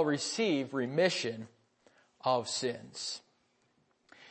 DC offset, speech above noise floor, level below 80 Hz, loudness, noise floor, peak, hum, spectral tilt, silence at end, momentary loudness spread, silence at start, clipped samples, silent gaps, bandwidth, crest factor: under 0.1%; 40 dB; -84 dBFS; -33 LUFS; -73 dBFS; -16 dBFS; none; -3.5 dB/octave; 0 s; 11 LU; 0 s; under 0.1%; none; 8.8 kHz; 20 dB